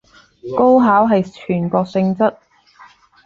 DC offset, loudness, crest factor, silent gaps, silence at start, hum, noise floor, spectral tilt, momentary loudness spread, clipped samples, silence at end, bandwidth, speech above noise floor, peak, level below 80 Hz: under 0.1%; -15 LUFS; 16 dB; none; 0.45 s; none; -46 dBFS; -9 dB/octave; 10 LU; under 0.1%; 0.95 s; 7.4 kHz; 32 dB; -2 dBFS; -54 dBFS